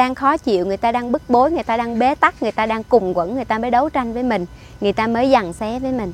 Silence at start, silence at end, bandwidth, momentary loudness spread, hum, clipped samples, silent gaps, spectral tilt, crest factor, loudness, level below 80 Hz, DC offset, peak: 0 s; 0 s; 13.5 kHz; 7 LU; none; under 0.1%; none; -6 dB/octave; 18 dB; -18 LUFS; -42 dBFS; under 0.1%; 0 dBFS